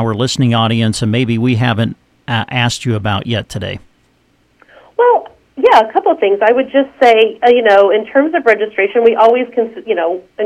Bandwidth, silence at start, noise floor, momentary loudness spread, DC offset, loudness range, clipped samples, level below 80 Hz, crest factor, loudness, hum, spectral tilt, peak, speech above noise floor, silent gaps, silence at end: 12.5 kHz; 0 s; -55 dBFS; 10 LU; under 0.1%; 7 LU; 0.2%; -48 dBFS; 12 dB; -12 LUFS; none; -6 dB/octave; 0 dBFS; 43 dB; none; 0 s